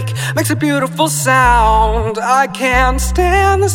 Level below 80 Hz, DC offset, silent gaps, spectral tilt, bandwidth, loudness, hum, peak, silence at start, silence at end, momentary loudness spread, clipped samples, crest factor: -22 dBFS; under 0.1%; none; -4.5 dB/octave; 17.5 kHz; -13 LUFS; none; 0 dBFS; 0 s; 0 s; 6 LU; under 0.1%; 12 dB